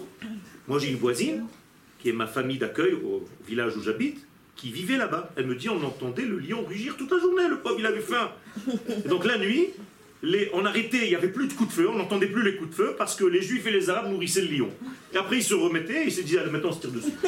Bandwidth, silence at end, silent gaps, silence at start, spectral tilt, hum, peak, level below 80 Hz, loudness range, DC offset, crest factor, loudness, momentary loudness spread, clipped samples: 16.5 kHz; 0 s; none; 0 s; -4 dB/octave; none; -8 dBFS; -70 dBFS; 4 LU; under 0.1%; 18 dB; -27 LUFS; 9 LU; under 0.1%